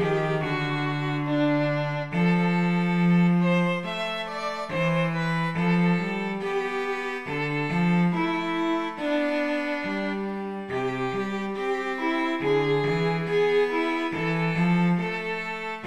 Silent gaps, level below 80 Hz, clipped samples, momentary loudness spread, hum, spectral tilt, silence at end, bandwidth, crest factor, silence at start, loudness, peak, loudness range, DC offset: none; -58 dBFS; under 0.1%; 7 LU; none; -7.5 dB/octave; 0 s; 8.6 kHz; 14 dB; 0 s; -25 LUFS; -12 dBFS; 4 LU; 0.4%